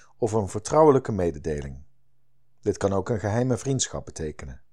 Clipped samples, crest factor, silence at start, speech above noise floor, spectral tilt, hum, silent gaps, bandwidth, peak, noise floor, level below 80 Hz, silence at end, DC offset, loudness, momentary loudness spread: under 0.1%; 20 dB; 0.2 s; 47 dB; -5.5 dB/octave; none; none; 11.5 kHz; -6 dBFS; -72 dBFS; -48 dBFS; 0.15 s; 0.5%; -25 LUFS; 16 LU